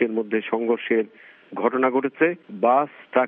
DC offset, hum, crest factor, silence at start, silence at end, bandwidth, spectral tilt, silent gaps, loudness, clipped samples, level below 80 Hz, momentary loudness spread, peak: under 0.1%; none; 18 dB; 0 s; 0 s; 3.7 kHz; -4 dB/octave; none; -23 LUFS; under 0.1%; -80 dBFS; 5 LU; -6 dBFS